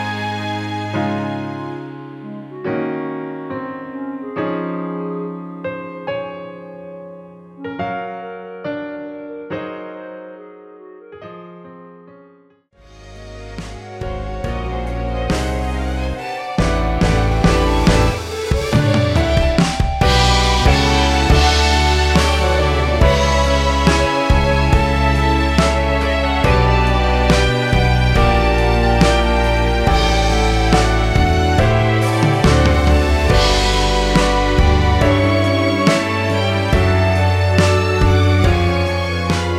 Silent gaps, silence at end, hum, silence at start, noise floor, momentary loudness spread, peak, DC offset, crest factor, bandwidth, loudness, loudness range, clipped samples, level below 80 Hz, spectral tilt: none; 0 s; none; 0 s; -51 dBFS; 16 LU; 0 dBFS; under 0.1%; 16 dB; 14 kHz; -16 LUFS; 15 LU; under 0.1%; -20 dBFS; -5.5 dB/octave